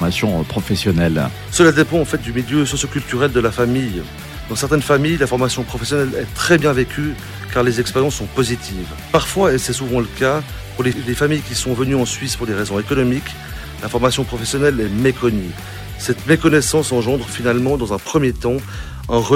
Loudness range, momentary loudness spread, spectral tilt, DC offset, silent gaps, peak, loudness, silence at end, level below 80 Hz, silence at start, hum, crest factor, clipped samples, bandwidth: 2 LU; 10 LU; -5 dB/octave; under 0.1%; none; -2 dBFS; -18 LUFS; 0 s; -34 dBFS; 0 s; none; 16 dB; under 0.1%; 16.5 kHz